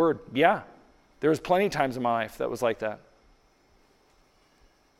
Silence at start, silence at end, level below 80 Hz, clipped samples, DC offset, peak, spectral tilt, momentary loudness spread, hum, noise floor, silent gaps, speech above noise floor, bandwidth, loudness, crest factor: 0 s; 2.05 s; -60 dBFS; under 0.1%; under 0.1%; -6 dBFS; -5.5 dB/octave; 9 LU; none; -63 dBFS; none; 37 dB; 15.5 kHz; -27 LUFS; 24 dB